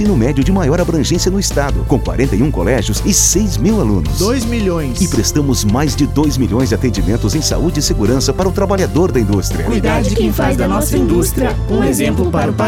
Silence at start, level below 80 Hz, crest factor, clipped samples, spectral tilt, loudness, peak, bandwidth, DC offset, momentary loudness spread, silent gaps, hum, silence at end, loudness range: 0 s; -22 dBFS; 12 dB; under 0.1%; -5 dB/octave; -14 LUFS; 0 dBFS; 17 kHz; under 0.1%; 2 LU; none; none; 0 s; 1 LU